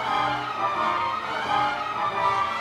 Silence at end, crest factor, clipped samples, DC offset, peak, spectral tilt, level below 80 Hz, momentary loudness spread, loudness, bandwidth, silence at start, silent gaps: 0 s; 14 dB; under 0.1%; under 0.1%; -10 dBFS; -4 dB/octave; -58 dBFS; 3 LU; -25 LUFS; 14.5 kHz; 0 s; none